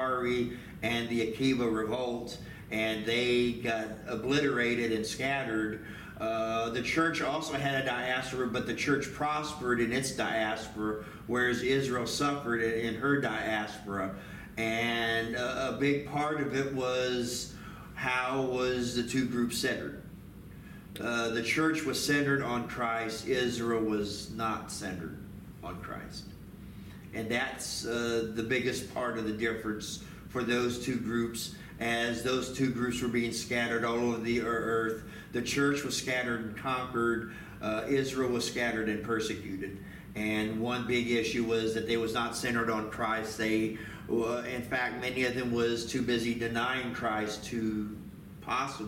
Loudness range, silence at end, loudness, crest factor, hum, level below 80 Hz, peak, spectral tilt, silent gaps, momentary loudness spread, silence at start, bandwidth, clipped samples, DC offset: 3 LU; 0 s; -32 LUFS; 16 dB; none; -56 dBFS; -16 dBFS; -4.5 dB/octave; none; 11 LU; 0 s; 17 kHz; under 0.1%; under 0.1%